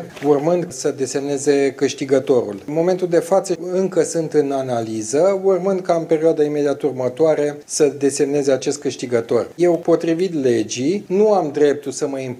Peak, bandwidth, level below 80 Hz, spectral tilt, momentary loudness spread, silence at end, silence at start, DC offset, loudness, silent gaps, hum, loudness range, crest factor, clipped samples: -2 dBFS; 14 kHz; -68 dBFS; -5 dB/octave; 6 LU; 0 s; 0 s; under 0.1%; -18 LUFS; none; none; 1 LU; 16 dB; under 0.1%